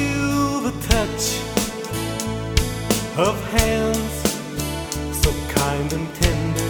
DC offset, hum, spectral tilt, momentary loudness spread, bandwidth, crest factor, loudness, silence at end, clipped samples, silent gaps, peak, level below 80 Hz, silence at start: under 0.1%; none; -4.5 dB/octave; 6 LU; over 20 kHz; 20 dB; -22 LUFS; 0 s; under 0.1%; none; 0 dBFS; -30 dBFS; 0 s